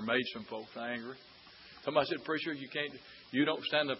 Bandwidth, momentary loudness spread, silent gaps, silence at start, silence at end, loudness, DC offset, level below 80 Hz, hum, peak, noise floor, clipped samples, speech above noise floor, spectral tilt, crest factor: 5.8 kHz; 20 LU; none; 0 s; 0 s; -35 LUFS; under 0.1%; -76 dBFS; none; -14 dBFS; -55 dBFS; under 0.1%; 20 dB; -2 dB/octave; 22 dB